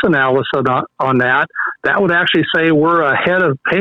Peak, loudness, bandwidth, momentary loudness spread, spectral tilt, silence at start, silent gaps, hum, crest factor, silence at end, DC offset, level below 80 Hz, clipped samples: -4 dBFS; -14 LUFS; 6.6 kHz; 5 LU; -7.5 dB/octave; 0 s; none; none; 10 dB; 0 s; under 0.1%; -52 dBFS; under 0.1%